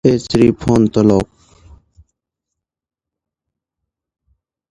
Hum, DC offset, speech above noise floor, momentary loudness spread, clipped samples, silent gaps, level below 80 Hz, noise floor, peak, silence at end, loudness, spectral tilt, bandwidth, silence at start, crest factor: none; under 0.1%; 72 dB; 5 LU; under 0.1%; none; -40 dBFS; -84 dBFS; 0 dBFS; 3.45 s; -13 LUFS; -7.5 dB/octave; 11.5 kHz; 0.05 s; 18 dB